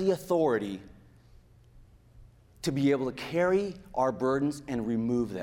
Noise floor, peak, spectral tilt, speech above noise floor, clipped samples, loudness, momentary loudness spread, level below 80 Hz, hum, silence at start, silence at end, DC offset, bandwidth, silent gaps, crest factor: -56 dBFS; -14 dBFS; -6.5 dB/octave; 28 dB; under 0.1%; -29 LUFS; 8 LU; -58 dBFS; none; 0 s; 0 s; under 0.1%; 16 kHz; none; 16 dB